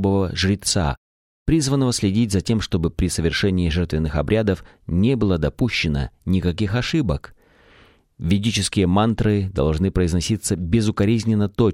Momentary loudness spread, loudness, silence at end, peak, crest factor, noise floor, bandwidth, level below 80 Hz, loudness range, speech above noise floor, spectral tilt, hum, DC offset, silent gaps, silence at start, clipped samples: 5 LU; -21 LUFS; 0 s; -4 dBFS; 16 dB; -53 dBFS; 14 kHz; -34 dBFS; 3 LU; 33 dB; -5.5 dB/octave; none; under 0.1%; 0.97-1.46 s; 0 s; under 0.1%